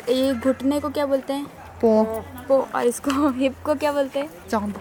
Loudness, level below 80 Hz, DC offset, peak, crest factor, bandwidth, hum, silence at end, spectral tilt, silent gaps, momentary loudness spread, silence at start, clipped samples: -23 LUFS; -52 dBFS; under 0.1%; -6 dBFS; 16 dB; 19 kHz; none; 0 s; -5 dB/octave; none; 9 LU; 0 s; under 0.1%